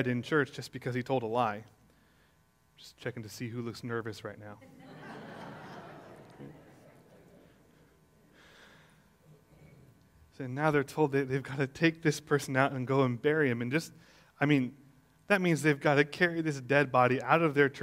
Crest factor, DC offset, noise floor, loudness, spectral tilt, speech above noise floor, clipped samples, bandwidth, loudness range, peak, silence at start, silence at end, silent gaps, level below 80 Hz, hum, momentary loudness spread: 24 dB; under 0.1%; -68 dBFS; -30 LUFS; -6 dB/octave; 38 dB; under 0.1%; 16 kHz; 21 LU; -8 dBFS; 0 s; 0 s; none; -70 dBFS; none; 21 LU